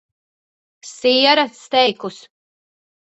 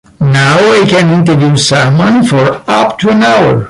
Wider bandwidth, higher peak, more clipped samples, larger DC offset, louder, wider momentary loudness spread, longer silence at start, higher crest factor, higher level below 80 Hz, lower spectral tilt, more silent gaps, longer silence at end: second, 8.2 kHz vs 11.5 kHz; about the same, -2 dBFS vs 0 dBFS; neither; neither; second, -16 LUFS vs -7 LUFS; first, 18 LU vs 4 LU; first, 0.85 s vs 0.2 s; first, 18 dB vs 8 dB; second, -70 dBFS vs -40 dBFS; second, -2.5 dB/octave vs -5.5 dB/octave; neither; first, 1 s vs 0 s